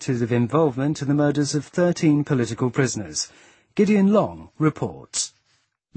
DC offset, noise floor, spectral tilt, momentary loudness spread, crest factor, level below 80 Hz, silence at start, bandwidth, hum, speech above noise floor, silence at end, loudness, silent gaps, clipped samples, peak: under 0.1%; -67 dBFS; -5.5 dB/octave; 9 LU; 18 dB; -58 dBFS; 0 s; 8.8 kHz; none; 46 dB; 0.7 s; -22 LUFS; none; under 0.1%; -4 dBFS